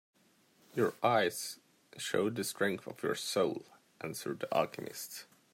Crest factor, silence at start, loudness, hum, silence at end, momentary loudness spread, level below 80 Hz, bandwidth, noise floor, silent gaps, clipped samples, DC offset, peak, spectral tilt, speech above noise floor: 20 dB; 0.75 s; -35 LUFS; none; 0.3 s; 14 LU; -80 dBFS; 16 kHz; -68 dBFS; none; under 0.1%; under 0.1%; -16 dBFS; -4 dB/octave; 34 dB